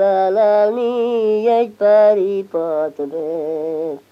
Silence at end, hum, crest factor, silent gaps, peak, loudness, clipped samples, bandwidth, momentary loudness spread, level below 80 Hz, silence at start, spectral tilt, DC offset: 0.1 s; none; 12 dB; none; -4 dBFS; -17 LUFS; under 0.1%; 6 kHz; 11 LU; -74 dBFS; 0 s; -7 dB/octave; under 0.1%